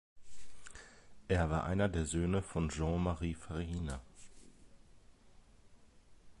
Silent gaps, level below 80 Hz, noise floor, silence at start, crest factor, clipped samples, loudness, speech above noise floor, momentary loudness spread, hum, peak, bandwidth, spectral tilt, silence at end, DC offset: none; -48 dBFS; -62 dBFS; 0.15 s; 18 dB; under 0.1%; -37 LUFS; 26 dB; 23 LU; none; -20 dBFS; 11.5 kHz; -6 dB/octave; 0 s; under 0.1%